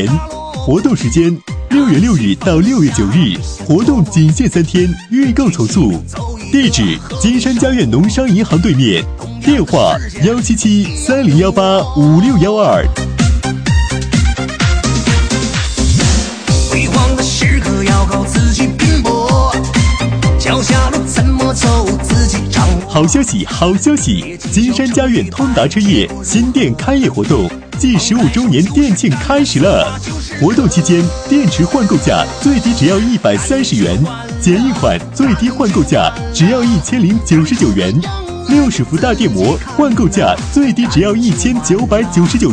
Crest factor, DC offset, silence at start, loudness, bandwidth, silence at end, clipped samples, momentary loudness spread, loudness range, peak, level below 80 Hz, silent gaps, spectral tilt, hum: 12 dB; under 0.1%; 0 s; -12 LUFS; 10.5 kHz; 0 s; under 0.1%; 4 LU; 1 LU; 0 dBFS; -22 dBFS; none; -5.5 dB/octave; none